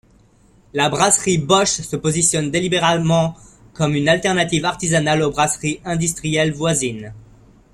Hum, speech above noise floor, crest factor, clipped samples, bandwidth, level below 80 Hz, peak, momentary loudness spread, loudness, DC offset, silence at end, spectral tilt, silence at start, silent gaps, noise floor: none; 34 dB; 18 dB; under 0.1%; 15 kHz; -46 dBFS; 0 dBFS; 7 LU; -17 LUFS; under 0.1%; 0.55 s; -3.5 dB/octave; 0.75 s; none; -52 dBFS